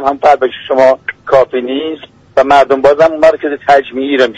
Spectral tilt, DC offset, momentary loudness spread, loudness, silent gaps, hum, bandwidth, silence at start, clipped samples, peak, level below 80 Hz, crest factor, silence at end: -5 dB/octave; under 0.1%; 9 LU; -10 LUFS; none; none; 8.8 kHz; 0 s; 0.3%; 0 dBFS; -46 dBFS; 10 dB; 0 s